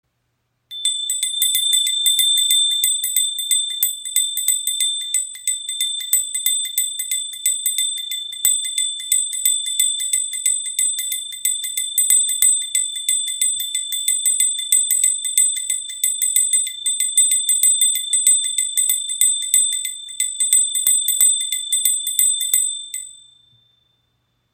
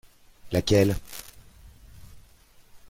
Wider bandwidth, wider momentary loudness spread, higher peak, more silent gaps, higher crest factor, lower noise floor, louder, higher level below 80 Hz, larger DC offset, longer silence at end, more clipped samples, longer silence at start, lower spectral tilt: about the same, 17 kHz vs 16.5 kHz; second, 7 LU vs 20 LU; first, 0 dBFS vs -10 dBFS; neither; about the same, 18 dB vs 20 dB; first, -70 dBFS vs -55 dBFS; first, -16 LUFS vs -24 LUFS; second, -72 dBFS vs -46 dBFS; neither; first, 1.4 s vs 0.15 s; neither; first, 0.7 s vs 0.45 s; second, 6.5 dB/octave vs -5.5 dB/octave